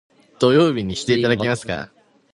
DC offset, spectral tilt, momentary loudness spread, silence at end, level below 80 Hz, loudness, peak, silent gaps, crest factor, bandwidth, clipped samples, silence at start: under 0.1%; -5.5 dB/octave; 13 LU; 0.45 s; -50 dBFS; -19 LUFS; -2 dBFS; none; 18 dB; 11.5 kHz; under 0.1%; 0.4 s